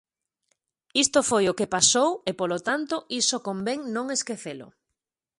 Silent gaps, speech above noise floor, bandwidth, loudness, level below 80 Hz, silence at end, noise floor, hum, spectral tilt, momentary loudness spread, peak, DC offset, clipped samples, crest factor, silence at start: none; 60 dB; 11.5 kHz; -24 LUFS; -64 dBFS; 0.7 s; -85 dBFS; none; -2 dB/octave; 11 LU; -6 dBFS; under 0.1%; under 0.1%; 22 dB; 0.95 s